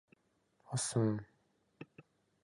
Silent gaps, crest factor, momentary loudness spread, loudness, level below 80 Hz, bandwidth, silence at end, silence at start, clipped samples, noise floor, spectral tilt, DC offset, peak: none; 20 dB; 22 LU; -37 LUFS; -74 dBFS; 11.5 kHz; 0.45 s; 0.7 s; under 0.1%; -77 dBFS; -5 dB/octave; under 0.1%; -22 dBFS